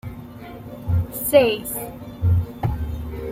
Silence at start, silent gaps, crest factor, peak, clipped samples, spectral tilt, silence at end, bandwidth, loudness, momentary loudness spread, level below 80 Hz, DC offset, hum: 0.05 s; none; 20 dB; -2 dBFS; under 0.1%; -5.5 dB/octave; 0 s; 16 kHz; -22 LUFS; 20 LU; -36 dBFS; under 0.1%; none